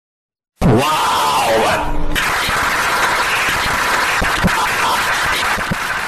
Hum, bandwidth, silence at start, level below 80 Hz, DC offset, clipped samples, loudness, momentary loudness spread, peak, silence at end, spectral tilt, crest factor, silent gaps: none; 16 kHz; 0.6 s; -28 dBFS; under 0.1%; under 0.1%; -15 LUFS; 4 LU; -6 dBFS; 0 s; -3 dB/octave; 10 dB; none